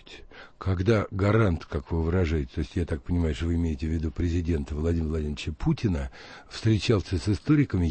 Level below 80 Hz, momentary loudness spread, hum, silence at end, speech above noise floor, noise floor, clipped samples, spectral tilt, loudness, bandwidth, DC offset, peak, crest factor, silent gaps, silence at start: -36 dBFS; 9 LU; none; 0 s; 20 dB; -46 dBFS; under 0.1%; -7.5 dB/octave; -27 LUFS; 8.6 kHz; under 0.1%; -12 dBFS; 14 dB; none; 0.1 s